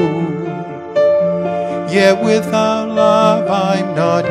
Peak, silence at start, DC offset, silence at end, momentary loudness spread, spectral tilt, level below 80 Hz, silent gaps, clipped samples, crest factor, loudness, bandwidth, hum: 0 dBFS; 0 s; under 0.1%; 0 s; 9 LU; -6 dB/octave; -56 dBFS; none; under 0.1%; 14 dB; -14 LUFS; 13 kHz; none